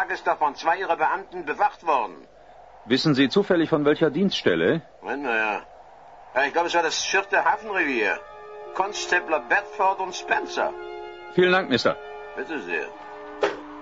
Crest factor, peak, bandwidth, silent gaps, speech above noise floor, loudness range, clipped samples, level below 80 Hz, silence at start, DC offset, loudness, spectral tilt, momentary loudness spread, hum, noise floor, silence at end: 18 dB; -6 dBFS; 7.8 kHz; none; 25 dB; 3 LU; under 0.1%; -62 dBFS; 0 s; 0.1%; -23 LUFS; -4.5 dB/octave; 13 LU; none; -48 dBFS; 0 s